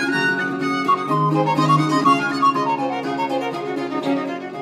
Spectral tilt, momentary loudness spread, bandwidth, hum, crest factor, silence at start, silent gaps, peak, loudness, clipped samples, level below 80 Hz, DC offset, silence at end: -6 dB/octave; 7 LU; 14.5 kHz; none; 16 dB; 0 s; none; -4 dBFS; -19 LUFS; under 0.1%; -66 dBFS; under 0.1%; 0 s